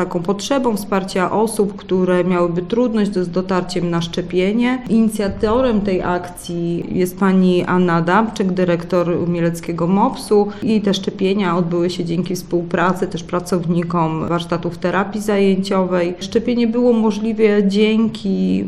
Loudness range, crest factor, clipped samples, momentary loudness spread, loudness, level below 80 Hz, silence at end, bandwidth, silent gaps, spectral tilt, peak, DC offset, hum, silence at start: 2 LU; 14 dB; under 0.1%; 6 LU; -17 LUFS; -42 dBFS; 0 s; 13.5 kHz; none; -6.5 dB/octave; -2 dBFS; 0.8%; none; 0 s